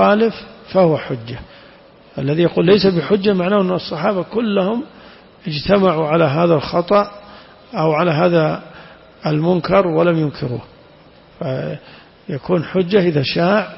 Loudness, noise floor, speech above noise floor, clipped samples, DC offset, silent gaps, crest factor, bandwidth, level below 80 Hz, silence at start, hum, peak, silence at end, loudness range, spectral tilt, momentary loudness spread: -17 LUFS; -45 dBFS; 30 dB; under 0.1%; under 0.1%; none; 14 dB; 5.8 kHz; -48 dBFS; 0 s; none; -2 dBFS; 0 s; 3 LU; -10.5 dB/octave; 14 LU